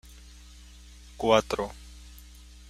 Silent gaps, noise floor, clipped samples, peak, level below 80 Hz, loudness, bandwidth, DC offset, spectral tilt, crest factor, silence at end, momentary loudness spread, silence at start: none; -49 dBFS; under 0.1%; -6 dBFS; -48 dBFS; -27 LUFS; 15.5 kHz; under 0.1%; -4.5 dB/octave; 24 dB; 0.5 s; 27 LU; 1.2 s